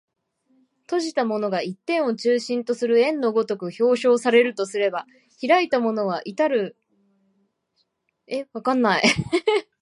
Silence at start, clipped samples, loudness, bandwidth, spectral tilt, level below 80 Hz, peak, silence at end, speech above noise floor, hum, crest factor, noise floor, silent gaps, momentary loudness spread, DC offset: 0.9 s; under 0.1%; -22 LUFS; 11 kHz; -4.5 dB/octave; -62 dBFS; -2 dBFS; 0.2 s; 50 dB; none; 20 dB; -71 dBFS; none; 9 LU; under 0.1%